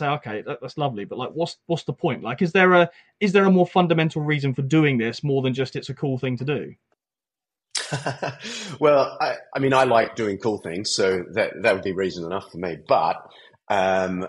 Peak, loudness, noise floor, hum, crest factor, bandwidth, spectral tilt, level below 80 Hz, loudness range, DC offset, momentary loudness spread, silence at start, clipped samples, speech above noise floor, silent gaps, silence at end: -4 dBFS; -22 LUFS; under -90 dBFS; none; 18 dB; 11.5 kHz; -5.5 dB/octave; -64 dBFS; 6 LU; under 0.1%; 13 LU; 0 s; under 0.1%; over 68 dB; none; 0 s